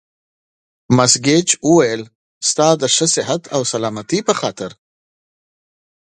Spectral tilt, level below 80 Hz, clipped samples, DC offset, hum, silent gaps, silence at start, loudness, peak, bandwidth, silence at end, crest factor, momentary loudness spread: -3.5 dB/octave; -56 dBFS; under 0.1%; under 0.1%; none; 2.15-2.41 s; 0.9 s; -15 LUFS; 0 dBFS; 11.5 kHz; 1.3 s; 18 dB; 10 LU